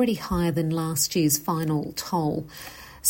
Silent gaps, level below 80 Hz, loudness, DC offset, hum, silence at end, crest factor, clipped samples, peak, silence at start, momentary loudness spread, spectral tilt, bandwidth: none; -46 dBFS; -25 LUFS; under 0.1%; none; 0 s; 20 dB; under 0.1%; -6 dBFS; 0 s; 13 LU; -4.5 dB/octave; 16.5 kHz